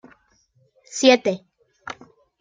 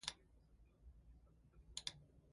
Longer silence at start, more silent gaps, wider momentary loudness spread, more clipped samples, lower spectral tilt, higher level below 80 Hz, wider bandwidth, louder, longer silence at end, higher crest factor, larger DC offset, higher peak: first, 0.95 s vs 0 s; neither; first, 23 LU vs 19 LU; neither; first, -3 dB/octave vs -1 dB/octave; about the same, -72 dBFS vs -68 dBFS; second, 9.4 kHz vs 11.5 kHz; first, -18 LUFS vs -51 LUFS; first, 0.5 s vs 0 s; second, 22 dB vs 32 dB; neither; first, -2 dBFS vs -24 dBFS